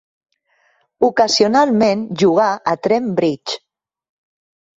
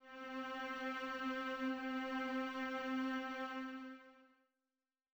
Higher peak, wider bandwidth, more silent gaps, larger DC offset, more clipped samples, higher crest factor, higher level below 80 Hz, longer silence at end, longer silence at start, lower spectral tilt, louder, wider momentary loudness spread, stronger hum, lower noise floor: first, -2 dBFS vs -32 dBFS; second, 8 kHz vs over 20 kHz; neither; neither; neither; about the same, 16 dB vs 12 dB; first, -60 dBFS vs -80 dBFS; first, 1.2 s vs 0.9 s; first, 1 s vs 0 s; about the same, -4.5 dB/octave vs -3.5 dB/octave; first, -16 LUFS vs -43 LUFS; about the same, 8 LU vs 8 LU; neither; second, -61 dBFS vs under -90 dBFS